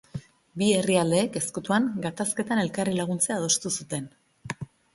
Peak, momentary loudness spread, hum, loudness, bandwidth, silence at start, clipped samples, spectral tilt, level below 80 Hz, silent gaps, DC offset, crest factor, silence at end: -8 dBFS; 16 LU; none; -26 LUFS; 12 kHz; 0.15 s; under 0.1%; -4 dB/octave; -62 dBFS; none; under 0.1%; 18 dB; 0.3 s